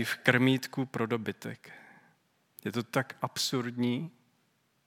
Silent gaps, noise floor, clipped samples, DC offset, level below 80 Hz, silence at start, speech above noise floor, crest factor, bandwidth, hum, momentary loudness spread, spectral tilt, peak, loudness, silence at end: none; -73 dBFS; under 0.1%; under 0.1%; -80 dBFS; 0 s; 41 dB; 28 dB; 17.5 kHz; none; 17 LU; -4.5 dB/octave; -6 dBFS; -31 LUFS; 0.75 s